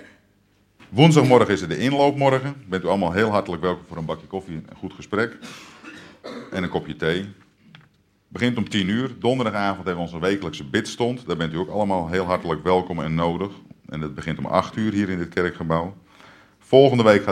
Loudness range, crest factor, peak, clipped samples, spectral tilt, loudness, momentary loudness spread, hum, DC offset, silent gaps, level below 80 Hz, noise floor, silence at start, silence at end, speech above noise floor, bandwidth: 10 LU; 22 dB; 0 dBFS; under 0.1%; -6.5 dB/octave; -22 LUFS; 18 LU; none; under 0.1%; none; -52 dBFS; -61 dBFS; 0 s; 0 s; 40 dB; 13 kHz